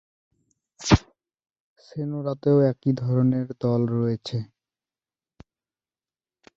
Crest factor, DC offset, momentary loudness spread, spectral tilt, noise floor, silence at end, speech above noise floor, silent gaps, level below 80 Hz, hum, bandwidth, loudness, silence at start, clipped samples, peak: 24 dB; under 0.1%; 13 LU; -7 dB/octave; under -90 dBFS; 2.1 s; over 67 dB; 1.60-1.76 s; -44 dBFS; none; 7.8 kHz; -24 LUFS; 0.8 s; under 0.1%; -2 dBFS